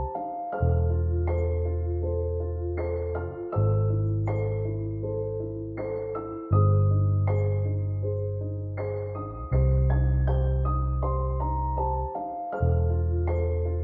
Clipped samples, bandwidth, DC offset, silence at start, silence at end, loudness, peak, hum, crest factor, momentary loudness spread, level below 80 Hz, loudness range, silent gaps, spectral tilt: under 0.1%; 3.3 kHz; under 0.1%; 0 s; 0 s; -27 LUFS; -10 dBFS; none; 16 dB; 9 LU; -32 dBFS; 2 LU; none; -12.5 dB/octave